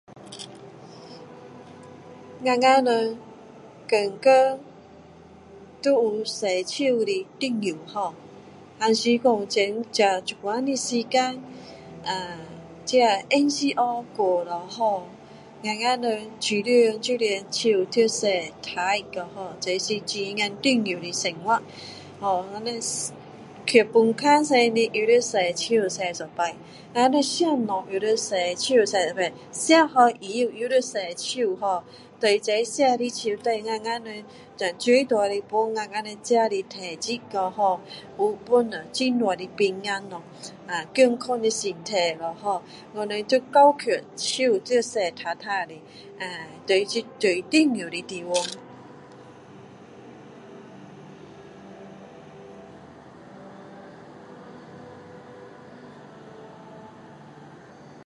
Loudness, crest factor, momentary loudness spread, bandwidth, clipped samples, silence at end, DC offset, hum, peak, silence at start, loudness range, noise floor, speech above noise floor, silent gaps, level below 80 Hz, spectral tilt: -24 LUFS; 22 dB; 24 LU; 11.5 kHz; under 0.1%; 0 s; under 0.1%; none; -2 dBFS; 0.1 s; 12 LU; -48 dBFS; 24 dB; none; -68 dBFS; -3 dB/octave